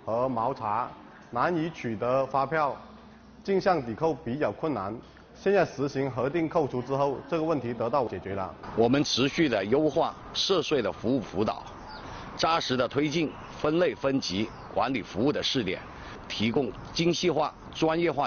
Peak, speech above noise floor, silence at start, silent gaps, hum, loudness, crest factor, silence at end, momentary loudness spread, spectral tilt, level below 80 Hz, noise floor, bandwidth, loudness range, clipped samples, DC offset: -12 dBFS; 23 dB; 0 s; none; none; -28 LUFS; 16 dB; 0 s; 10 LU; -4 dB/octave; -54 dBFS; -50 dBFS; 7 kHz; 3 LU; under 0.1%; under 0.1%